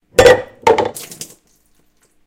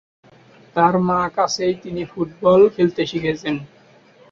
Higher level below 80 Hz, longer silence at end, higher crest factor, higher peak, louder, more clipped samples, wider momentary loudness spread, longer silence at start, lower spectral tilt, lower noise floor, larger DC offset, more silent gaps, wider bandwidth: first, -40 dBFS vs -54 dBFS; first, 1 s vs 0.65 s; about the same, 16 dB vs 16 dB; about the same, 0 dBFS vs -2 dBFS; first, -13 LUFS vs -19 LUFS; first, 0.2% vs under 0.1%; first, 22 LU vs 13 LU; second, 0.2 s vs 0.75 s; second, -3.5 dB/octave vs -5.5 dB/octave; first, -56 dBFS vs -50 dBFS; neither; neither; first, 17 kHz vs 7.6 kHz